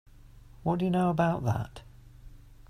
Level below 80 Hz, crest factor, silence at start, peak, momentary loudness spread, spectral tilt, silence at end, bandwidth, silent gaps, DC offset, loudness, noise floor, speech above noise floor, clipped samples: -52 dBFS; 18 dB; 0.25 s; -14 dBFS; 13 LU; -8 dB/octave; 0.05 s; 14 kHz; none; under 0.1%; -29 LUFS; -52 dBFS; 24 dB; under 0.1%